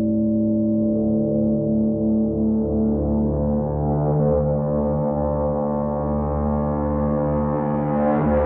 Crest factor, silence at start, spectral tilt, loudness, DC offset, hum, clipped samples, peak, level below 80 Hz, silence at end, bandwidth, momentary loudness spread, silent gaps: 10 dB; 0 s; -12 dB/octave; -21 LUFS; under 0.1%; none; under 0.1%; -10 dBFS; -32 dBFS; 0 s; 2.7 kHz; 3 LU; none